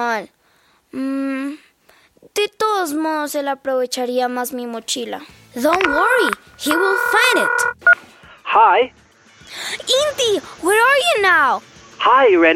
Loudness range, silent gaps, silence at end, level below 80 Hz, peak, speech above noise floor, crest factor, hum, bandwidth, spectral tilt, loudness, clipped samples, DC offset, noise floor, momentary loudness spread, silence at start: 7 LU; none; 0 s; -58 dBFS; -2 dBFS; 40 dB; 16 dB; none; 16.5 kHz; -1.5 dB/octave; -17 LUFS; under 0.1%; under 0.1%; -57 dBFS; 13 LU; 0 s